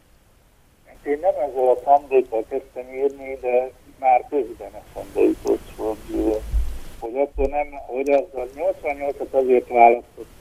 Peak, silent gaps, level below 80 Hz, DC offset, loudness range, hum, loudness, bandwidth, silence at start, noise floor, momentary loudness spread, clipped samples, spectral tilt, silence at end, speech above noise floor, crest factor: 0 dBFS; none; -36 dBFS; under 0.1%; 4 LU; none; -21 LUFS; 15.5 kHz; 1.05 s; -55 dBFS; 15 LU; under 0.1%; -7 dB/octave; 0.15 s; 34 dB; 22 dB